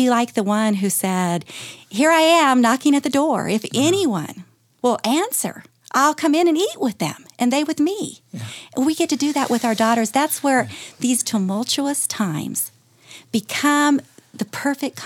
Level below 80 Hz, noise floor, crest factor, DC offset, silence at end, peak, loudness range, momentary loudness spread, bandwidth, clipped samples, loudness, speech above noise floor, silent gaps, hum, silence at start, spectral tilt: -70 dBFS; -46 dBFS; 16 dB; under 0.1%; 0 s; -2 dBFS; 4 LU; 12 LU; 18 kHz; under 0.1%; -19 LUFS; 26 dB; none; none; 0 s; -3.5 dB/octave